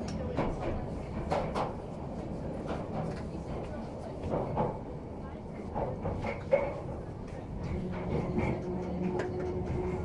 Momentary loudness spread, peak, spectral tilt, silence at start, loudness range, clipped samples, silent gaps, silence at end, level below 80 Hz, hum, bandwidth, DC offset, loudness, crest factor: 9 LU; -14 dBFS; -8 dB/octave; 0 s; 3 LU; under 0.1%; none; 0 s; -46 dBFS; none; 11.5 kHz; under 0.1%; -36 LUFS; 20 dB